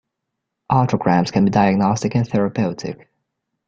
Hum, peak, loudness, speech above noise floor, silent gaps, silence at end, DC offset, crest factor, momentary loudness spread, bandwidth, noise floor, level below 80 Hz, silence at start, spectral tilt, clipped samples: none; -2 dBFS; -18 LUFS; 62 dB; none; 0.7 s; under 0.1%; 18 dB; 11 LU; 7.6 kHz; -79 dBFS; -50 dBFS; 0.7 s; -7 dB/octave; under 0.1%